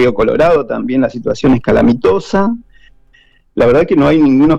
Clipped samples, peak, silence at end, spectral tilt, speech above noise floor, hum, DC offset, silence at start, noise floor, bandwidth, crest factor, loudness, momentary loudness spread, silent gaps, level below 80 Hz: under 0.1%; -4 dBFS; 0 s; -7.5 dB/octave; 39 dB; none; under 0.1%; 0 s; -49 dBFS; 8.2 kHz; 8 dB; -12 LUFS; 7 LU; none; -34 dBFS